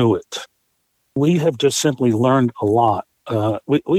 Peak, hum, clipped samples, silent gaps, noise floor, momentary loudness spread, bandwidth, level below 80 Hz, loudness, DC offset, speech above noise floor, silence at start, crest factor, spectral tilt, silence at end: -2 dBFS; none; under 0.1%; none; -68 dBFS; 9 LU; 15 kHz; -58 dBFS; -18 LUFS; under 0.1%; 51 dB; 0 s; 16 dB; -6 dB/octave; 0 s